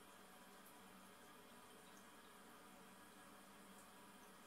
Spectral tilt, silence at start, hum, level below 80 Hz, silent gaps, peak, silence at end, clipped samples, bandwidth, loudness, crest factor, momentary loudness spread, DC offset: -3 dB/octave; 0 s; none; -86 dBFS; none; -50 dBFS; 0 s; under 0.1%; 16 kHz; -62 LUFS; 14 dB; 1 LU; under 0.1%